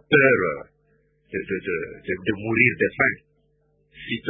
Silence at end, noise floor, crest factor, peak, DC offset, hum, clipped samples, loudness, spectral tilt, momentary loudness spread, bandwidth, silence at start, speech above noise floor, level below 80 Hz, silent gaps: 0 s; -65 dBFS; 22 dB; -2 dBFS; under 0.1%; 50 Hz at -55 dBFS; under 0.1%; -22 LUFS; -10.5 dB/octave; 16 LU; 3.8 kHz; 0.1 s; 43 dB; -54 dBFS; none